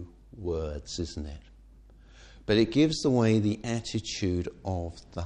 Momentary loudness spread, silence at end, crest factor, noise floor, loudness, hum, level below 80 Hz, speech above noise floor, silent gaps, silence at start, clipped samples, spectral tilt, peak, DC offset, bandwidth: 16 LU; 0 s; 20 dB; -53 dBFS; -29 LUFS; none; -46 dBFS; 25 dB; none; 0 s; under 0.1%; -6 dB/octave; -10 dBFS; under 0.1%; 10.5 kHz